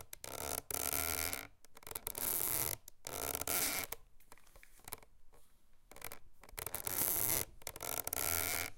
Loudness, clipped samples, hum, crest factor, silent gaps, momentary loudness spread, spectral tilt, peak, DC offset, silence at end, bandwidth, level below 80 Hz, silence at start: -37 LUFS; under 0.1%; none; 26 dB; none; 17 LU; -1.5 dB/octave; -14 dBFS; under 0.1%; 0 s; 17 kHz; -60 dBFS; 0 s